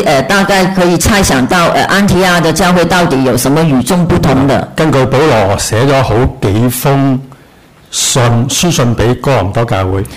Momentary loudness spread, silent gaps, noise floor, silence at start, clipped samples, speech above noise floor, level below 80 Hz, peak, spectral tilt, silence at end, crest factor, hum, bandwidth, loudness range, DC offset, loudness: 4 LU; none; -40 dBFS; 0 s; under 0.1%; 31 dB; -28 dBFS; 0 dBFS; -5 dB/octave; 0 s; 8 dB; none; 16 kHz; 3 LU; under 0.1%; -9 LUFS